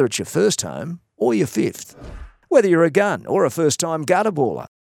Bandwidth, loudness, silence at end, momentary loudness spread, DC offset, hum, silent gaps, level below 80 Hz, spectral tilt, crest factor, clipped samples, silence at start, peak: 17.5 kHz; -19 LUFS; 0.15 s; 16 LU; under 0.1%; none; none; -48 dBFS; -4.5 dB/octave; 18 dB; under 0.1%; 0 s; -2 dBFS